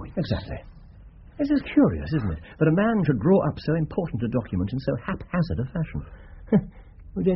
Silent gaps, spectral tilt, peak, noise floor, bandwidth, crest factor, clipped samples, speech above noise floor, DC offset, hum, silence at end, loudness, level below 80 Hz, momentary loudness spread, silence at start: none; -8 dB/octave; -8 dBFS; -46 dBFS; 5.8 kHz; 18 dB; under 0.1%; 23 dB; under 0.1%; none; 0 s; -25 LUFS; -42 dBFS; 12 LU; 0 s